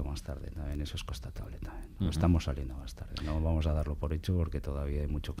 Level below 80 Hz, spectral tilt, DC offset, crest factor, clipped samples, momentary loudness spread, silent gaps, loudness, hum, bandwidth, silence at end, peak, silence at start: -38 dBFS; -7 dB/octave; under 0.1%; 18 dB; under 0.1%; 14 LU; none; -35 LUFS; none; 14.5 kHz; 0 s; -14 dBFS; 0 s